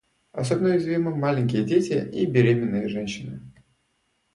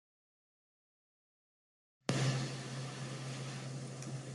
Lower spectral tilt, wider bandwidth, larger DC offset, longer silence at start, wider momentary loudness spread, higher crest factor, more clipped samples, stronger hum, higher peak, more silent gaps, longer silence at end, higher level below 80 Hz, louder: first, -7 dB/octave vs -5 dB/octave; about the same, 11.5 kHz vs 12 kHz; neither; second, 0.35 s vs 2.1 s; first, 13 LU vs 10 LU; second, 20 dB vs 30 dB; neither; neither; first, -6 dBFS vs -12 dBFS; neither; first, 0.85 s vs 0 s; first, -58 dBFS vs -74 dBFS; first, -23 LUFS vs -40 LUFS